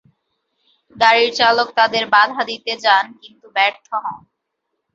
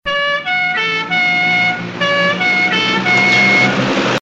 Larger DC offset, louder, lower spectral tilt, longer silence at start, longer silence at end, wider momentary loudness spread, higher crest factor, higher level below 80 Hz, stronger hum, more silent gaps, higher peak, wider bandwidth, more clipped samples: neither; second, -16 LUFS vs -12 LUFS; second, -2 dB/octave vs -4 dB/octave; first, 0.95 s vs 0.05 s; first, 0.75 s vs 0 s; first, 12 LU vs 7 LU; about the same, 18 dB vs 14 dB; second, -66 dBFS vs -52 dBFS; neither; neither; about the same, -2 dBFS vs 0 dBFS; second, 7.8 kHz vs 9.2 kHz; neither